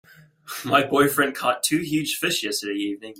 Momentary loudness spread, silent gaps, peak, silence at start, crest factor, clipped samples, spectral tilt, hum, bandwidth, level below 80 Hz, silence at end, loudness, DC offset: 9 LU; none; -4 dBFS; 0.45 s; 20 dB; under 0.1%; -3 dB/octave; none; 16.5 kHz; -62 dBFS; 0 s; -22 LUFS; under 0.1%